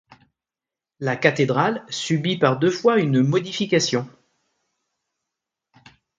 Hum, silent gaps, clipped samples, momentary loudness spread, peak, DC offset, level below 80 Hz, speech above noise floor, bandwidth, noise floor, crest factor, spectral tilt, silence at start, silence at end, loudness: none; none; under 0.1%; 8 LU; 0 dBFS; under 0.1%; -66 dBFS; 69 dB; 9.4 kHz; -89 dBFS; 22 dB; -5.5 dB/octave; 1 s; 2.1 s; -21 LUFS